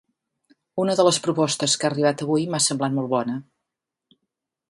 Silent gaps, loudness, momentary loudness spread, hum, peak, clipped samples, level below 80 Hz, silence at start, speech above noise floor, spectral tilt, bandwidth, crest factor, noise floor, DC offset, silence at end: none; -22 LUFS; 8 LU; none; -4 dBFS; under 0.1%; -68 dBFS; 0.75 s; 62 dB; -4 dB/octave; 11.5 kHz; 20 dB; -84 dBFS; under 0.1%; 1.3 s